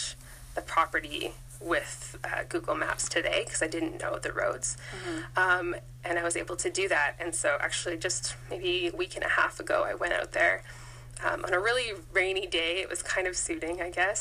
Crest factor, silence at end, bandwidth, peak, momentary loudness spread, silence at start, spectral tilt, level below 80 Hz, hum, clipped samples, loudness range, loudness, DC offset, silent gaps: 20 dB; 0 s; 15.5 kHz; -12 dBFS; 10 LU; 0 s; -2.5 dB/octave; -52 dBFS; none; under 0.1%; 2 LU; -30 LUFS; under 0.1%; none